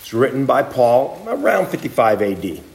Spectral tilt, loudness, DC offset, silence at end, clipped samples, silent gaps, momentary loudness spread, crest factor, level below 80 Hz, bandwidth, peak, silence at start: -6 dB/octave; -17 LUFS; under 0.1%; 0.1 s; under 0.1%; none; 7 LU; 16 dB; -56 dBFS; 16.5 kHz; -2 dBFS; 0 s